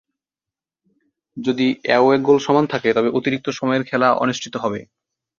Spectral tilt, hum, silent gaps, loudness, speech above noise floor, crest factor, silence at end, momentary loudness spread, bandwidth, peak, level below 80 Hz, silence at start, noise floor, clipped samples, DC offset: -5.5 dB/octave; none; none; -18 LUFS; 71 dB; 18 dB; 0.55 s; 10 LU; 7.4 kHz; -2 dBFS; -62 dBFS; 1.35 s; -89 dBFS; under 0.1%; under 0.1%